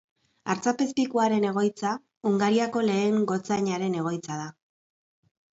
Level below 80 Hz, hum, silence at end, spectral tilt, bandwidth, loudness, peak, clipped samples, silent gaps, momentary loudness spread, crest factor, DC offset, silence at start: -72 dBFS; none; 1.05 s; -5.5 dB/octave; 8 kHz; -26 LUFS; -10 dBFS; under 0.1%; 2.17-2.21 s; 9 LU; 16 dB; under 0.1%; 0.45 s